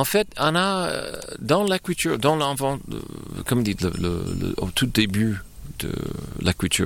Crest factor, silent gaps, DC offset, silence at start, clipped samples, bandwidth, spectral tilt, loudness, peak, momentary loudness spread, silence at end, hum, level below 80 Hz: 18 dB; none; under 0.1%; 0 s; under 0.1%; 17.5 kHz; -4.5 dB/octave; -24 LUFS; -6 dBFS; 12 LU; 0 s; none; -42 dBFS